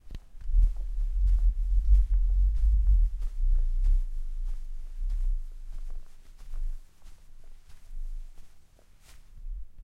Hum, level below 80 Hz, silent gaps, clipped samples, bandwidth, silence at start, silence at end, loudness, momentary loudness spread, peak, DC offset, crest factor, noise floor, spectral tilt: none; -26 dBFS; none; under 0.1%; 0.9 kHz; 0.05 s; 0 s; -31 LUFS; 20 LU; -12 dBFS; under 0.1%; 16 dB; -54 dBFS; -7 dB/octave